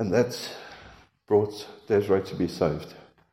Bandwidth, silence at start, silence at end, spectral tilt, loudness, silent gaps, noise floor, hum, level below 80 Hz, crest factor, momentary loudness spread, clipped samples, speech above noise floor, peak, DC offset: 16 kHz; 0 s; 0.3 s; -6 dB/octave; -27 LUFS; none; -51 dBFS; none; -60 dBFS; 18 dB; 19 LU; under 0.1%; 26 dB; -10 dBFS; under 0.1%